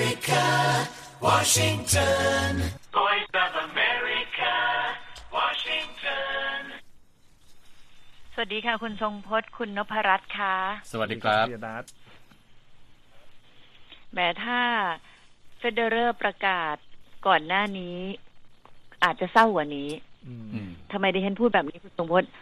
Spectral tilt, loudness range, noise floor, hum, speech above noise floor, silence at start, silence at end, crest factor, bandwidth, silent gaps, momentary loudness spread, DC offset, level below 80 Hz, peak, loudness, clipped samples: -3 dB/octave; 8 LU; -53 dBFS; none; 28 dB; 0 s; 0 s; 22 dB; 15 kHz; none; 15 LU; under 0.1%; -52 dBFS; -4 dBFS; -25 LUFS; under 0.1%